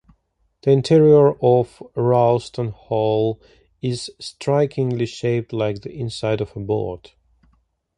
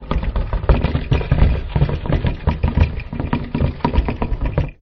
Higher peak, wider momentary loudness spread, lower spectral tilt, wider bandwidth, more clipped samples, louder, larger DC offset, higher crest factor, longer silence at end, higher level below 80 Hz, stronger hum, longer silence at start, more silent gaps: about the same, -2 dBFS vs -2 dBFS; first, 15 LU vs 6 LU; second, -7.5 dB/octave vs -9.5 dB/octave; first, 10.5 kHz vs 5.8 kHz; neither; about the same, -20 LUFS vs -20 LUFS; neither; about the same, 16 dB vs 14 dB; first, 1 s vs 0.1 s; second, -52 dBFS vs -20 dBFS; neither; first, 0.65 s vs 0 s; neither